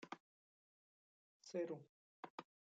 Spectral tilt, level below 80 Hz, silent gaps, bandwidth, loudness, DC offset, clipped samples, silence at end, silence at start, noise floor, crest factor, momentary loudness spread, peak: -5 dB/octave; under -90 dBFS; 0.20-1.40 s, 1.89-2.23 s, 2.30-2.38 s; 7.6 kHz; -52 LUFS; under 0.1%; under 0.1%; 0.35 s; 0 s; under -90 dBFS; 20 dB; 14 LU; -34 dBFS